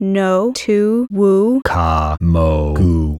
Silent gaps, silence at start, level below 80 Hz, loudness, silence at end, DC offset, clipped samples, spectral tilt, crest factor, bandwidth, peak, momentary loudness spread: none; 0 s; -24 dBFS; -15 LUFS; 0 s; under 0.1%; under 0.1%; -7.5 dB/octave; 14 dB; 12.5 kHz; 0 dBFS; 3 LU